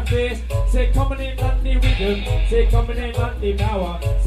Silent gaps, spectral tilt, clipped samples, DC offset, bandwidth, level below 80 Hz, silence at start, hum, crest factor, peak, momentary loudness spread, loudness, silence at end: none; -6.5 dB/octave; under 0.1%; under 0.1%; 13 kHz; -20 dBFS; 0 s; none; 14 dB; -4 dBFS; 5 LU; -21 LUFS; 0 s